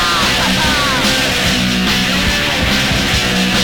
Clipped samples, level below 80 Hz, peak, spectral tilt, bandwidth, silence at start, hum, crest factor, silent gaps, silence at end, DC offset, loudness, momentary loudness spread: under 0.1%; -26 dBFS; -2 dBFS; -3 dB/octave; 19 kHz; 0 s; none; 12 dB; none; 0 s; under 0.1%; -12 LUFS; 1 LU